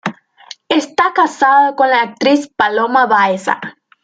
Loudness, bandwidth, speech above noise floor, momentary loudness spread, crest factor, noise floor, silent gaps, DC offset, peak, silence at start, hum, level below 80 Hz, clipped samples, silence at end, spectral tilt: -13 LUFS; 9.2 kHz; 26 dB; 9 LU; 12 dB; -39 dBFS; none; under 0.1%; -2 dBFS; 0.05 s; none; -64 dBFS; under 0.1%; 0.35 s; -4 dB/octave